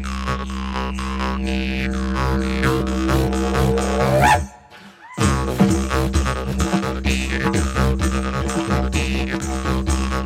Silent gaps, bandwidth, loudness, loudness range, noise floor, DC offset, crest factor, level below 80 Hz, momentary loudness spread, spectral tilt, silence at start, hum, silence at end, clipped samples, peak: none; 16 kHz; -20 LUFS; 2 LU; -43 dBFS; under 0.1%; 18 dB; -26 dBFS; 7 LU; -5.5 dB/octave; 0 s; none; 0 s; under 0.1%; -2 dBFS